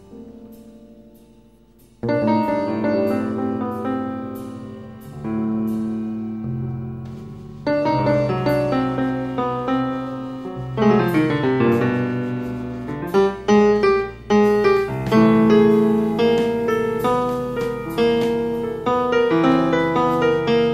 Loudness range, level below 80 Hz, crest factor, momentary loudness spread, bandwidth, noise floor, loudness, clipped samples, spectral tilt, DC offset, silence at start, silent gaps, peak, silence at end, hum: 9 LU; -46 dBFS; 16 dB; 14 LU; 15 kHz; -51 dBFS; -20 LUFS; under 0.1%; -7.5 dB/octave; under 0.1%; 0.1 s; none; -4 dBFS; 0 s; none